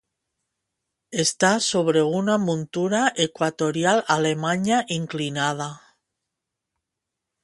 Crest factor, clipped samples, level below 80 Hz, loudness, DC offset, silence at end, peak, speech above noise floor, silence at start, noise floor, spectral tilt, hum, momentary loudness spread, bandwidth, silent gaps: 20 dB; under 0.1%; -66 dBFS; -22 LUFS; under 0.1%; 1.65 s; -4 dBFS; 62 dB; 1.1 s; -84 dBFS; -4 dB/octave; none; 7 LU; 11.5 kHz; none